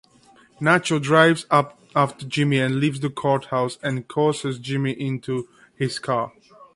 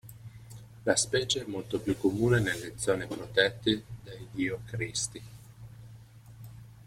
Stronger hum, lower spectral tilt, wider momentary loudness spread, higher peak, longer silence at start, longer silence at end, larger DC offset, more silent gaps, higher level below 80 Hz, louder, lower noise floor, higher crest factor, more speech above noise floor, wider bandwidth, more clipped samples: neither; first, -5.5 dB/octave vs -4 dB/octave; second, 11 LU vs 23 LU; first, -4 dBFS vs -8 dBFS; first, 0.6 s vs 0.05 s; about the same, 0.1 s vs 0 s; neither; neither; second, -62 dBFS vs -56 dBFS; first, -22 LUFS vs -30 LUFS; about the same, -54 dBFS vs -51 dBFS; about the same, 20 dB vs 24 dB; first, 33 dB vs 21 dB; second, 11.5 kHz vs 16 kHz; neither